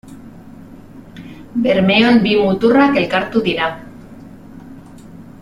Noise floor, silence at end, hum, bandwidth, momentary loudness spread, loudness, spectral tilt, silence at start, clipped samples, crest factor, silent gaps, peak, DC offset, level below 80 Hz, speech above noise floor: -37 dBFS; 0.2 s; none; 11 kHz; 24 LU; -14 LUFS; -7 dB/octave; 0.05 s; under 0.1%; 16 dB; none; -2 dBFS; under 0.1%; -48 dBFS; 24 dB